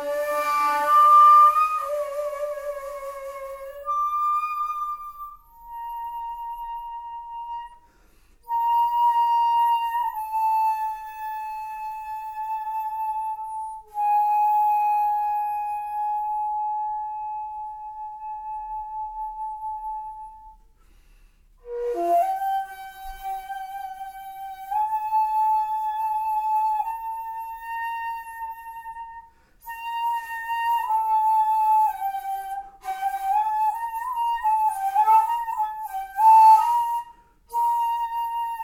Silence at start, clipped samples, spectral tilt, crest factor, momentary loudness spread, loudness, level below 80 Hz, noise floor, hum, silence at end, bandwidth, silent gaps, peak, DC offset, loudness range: 0 s; under 0.1%; -2 dB/octave; 18 dB; 16 LU; -23 LUFS; -58 dBFS; -56 dBFS; none; 0 s; 17 kHz; none; -6 dBFS; under 0.1%; 13 LU